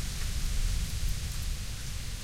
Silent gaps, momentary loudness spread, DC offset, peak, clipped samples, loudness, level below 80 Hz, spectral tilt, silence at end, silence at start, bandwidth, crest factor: none; 4 LU; under 0.1%; -18 dBFS; under 0.1%; -36 LUFS; -32 dBFS; -3 dB/octave; 0 s; 0 s; 16.5 kHz; 14 dB